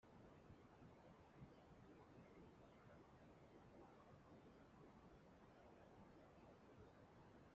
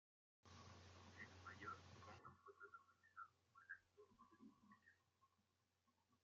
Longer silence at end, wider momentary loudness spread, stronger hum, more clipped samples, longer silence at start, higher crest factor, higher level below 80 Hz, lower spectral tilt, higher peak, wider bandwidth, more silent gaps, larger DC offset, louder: about the same, 0 s vs 0.05 s; second, 2 LU vs 11 LU; neither; neither; second, 0 s vs 0.45 s; second, 16 dB vs 22 dB; first, -80 dBFS vs under -90 dBFS; first, -6 dB/octave vs -3 dB/octave; second, -50 dBFS vs -44 dBFS; about the same, 7.2 kHz vs 7.4 kHz; neither; neither; second, -68 LUFS vs -63 LUFS